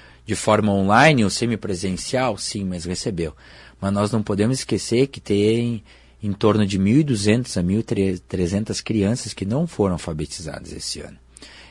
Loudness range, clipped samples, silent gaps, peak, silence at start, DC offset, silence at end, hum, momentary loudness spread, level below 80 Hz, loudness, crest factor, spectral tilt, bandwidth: 4 LU; under 0.1%; none; -2 dBFS; 0.25 s; under 0.1%; 0.05 s; none; 11 LU; -48 dBFS; -21 LUFS; 20 dB; -5.5 dB/octave; 11.5 kHz